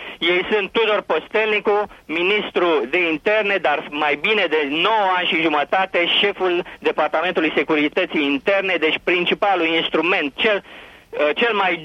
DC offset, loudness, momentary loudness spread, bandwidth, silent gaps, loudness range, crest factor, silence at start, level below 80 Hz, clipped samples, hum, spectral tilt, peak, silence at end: under 0.1%; -18 LUFS; 4 LU; 9.4 kHz; none; 1 LU; 14 dB; 0 s; -58 dBFS; under 0.1%; none; -5 dB/octave; -6 dBFS; 0 s